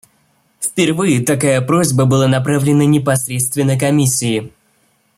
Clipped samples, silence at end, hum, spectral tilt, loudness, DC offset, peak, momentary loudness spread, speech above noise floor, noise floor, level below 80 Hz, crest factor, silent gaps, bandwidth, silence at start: under 0.1%; 0.7 s; none; -5 dB/octave; -14 LUFS; under 0.1%; -2 dBFS; 5 LU; 45 dB; -58 dBFS; -52 dBFS; 12 dB; none; 16 kHz; 0.6 s